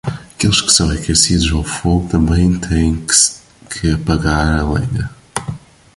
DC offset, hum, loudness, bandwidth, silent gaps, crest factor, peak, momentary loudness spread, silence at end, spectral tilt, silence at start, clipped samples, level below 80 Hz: under 0.1%; none; -14 LUFS; 11.5 kHz; none; 16 dB; 0 dBFS; 14 LU; 0.4 s; -3.5 dB/octave; 0.05 s; under 0.1%; -24 dBFS